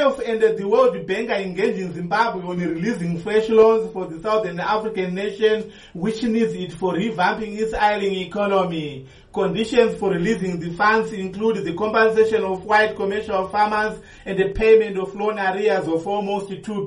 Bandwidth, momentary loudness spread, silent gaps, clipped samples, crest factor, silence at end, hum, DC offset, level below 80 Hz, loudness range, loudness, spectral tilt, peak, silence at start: 10.5 kHz; 10 LU; none; under 0.1%; 16 dB; 0 s; none; under 0.1%; -46 dBFS; 3 LU; -21 LUFS; -6 dB/octave; -4 dBFS; 0 s